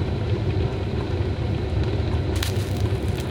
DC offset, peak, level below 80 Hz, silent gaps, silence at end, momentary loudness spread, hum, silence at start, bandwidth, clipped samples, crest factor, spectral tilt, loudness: under 0.1%; -2 dBFS; -32 dBFS; none; 0 s; 2 LU; none; 0 s; 18.5 kHz; under 0.1%; 22 dB; -6.5 dB/octave; -25 LUFS